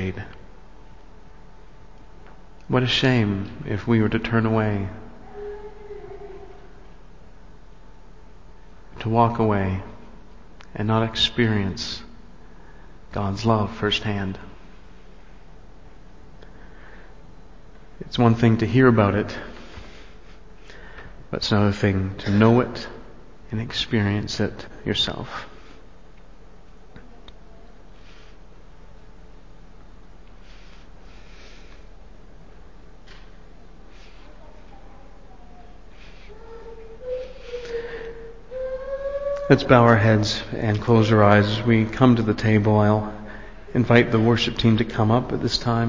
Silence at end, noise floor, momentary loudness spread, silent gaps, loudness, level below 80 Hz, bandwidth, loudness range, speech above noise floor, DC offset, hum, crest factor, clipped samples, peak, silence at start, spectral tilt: 0 s; -48 dBFS; 24 LU; none; -21 LUFS; -44 dBFS; 7.6 kHz; 17 LU; 28 dB; 0.9%; none; 24 dB; under 0.1%; 0 dBFS; 0 s; -6.5 dB/octave